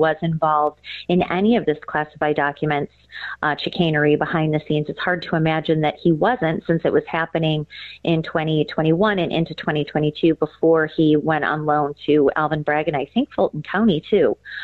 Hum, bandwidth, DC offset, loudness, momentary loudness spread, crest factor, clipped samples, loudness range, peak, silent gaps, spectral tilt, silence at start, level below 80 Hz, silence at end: none; 4.8 kHz; under 0.1%; -20 LUFS; 5 LU; 14 dB; under 0.1%; 2 LU; -6 dBFS; none; -9 dB/octave; 0 s; -52 dBFS; 0 s